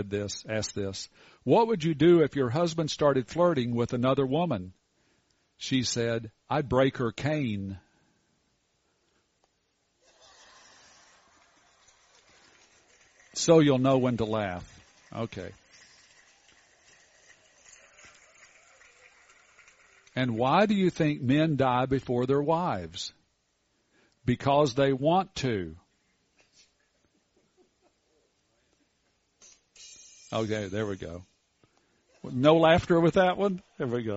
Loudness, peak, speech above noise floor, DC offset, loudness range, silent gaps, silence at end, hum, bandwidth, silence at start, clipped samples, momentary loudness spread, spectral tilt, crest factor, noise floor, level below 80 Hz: -27 LUFS; -8 dBFS; 48 dB; under 0.1%; 13 LU; none; 0 s; none; 8 kHz; 0 s; under 0.1%; 17 LU; -5.5 dB/octave; 22 dB; -74 dBFS; -58 dBFS